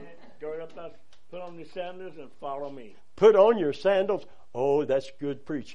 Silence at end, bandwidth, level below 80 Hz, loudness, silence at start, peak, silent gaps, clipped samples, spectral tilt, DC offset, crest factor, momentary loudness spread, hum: 0 s; 8 kHz; -66 dBFS; -25 LUFS; 0 s; -8 dBFS; none; under 0.1%; -6.5 dB/octave; 0.9%; 20 dB; 22 LU; none